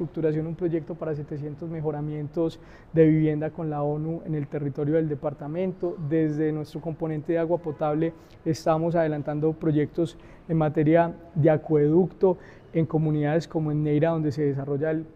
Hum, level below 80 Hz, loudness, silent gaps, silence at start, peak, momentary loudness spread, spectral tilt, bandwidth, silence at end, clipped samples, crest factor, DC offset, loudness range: none; -54 dBFS; -26 LUFS; none; 0 s; -8 dBFS; 10 LU; -9 dB/octave; 8 kHz; 0.05 s; under 0.1%; 18 dB; under 0.1%; 4 LU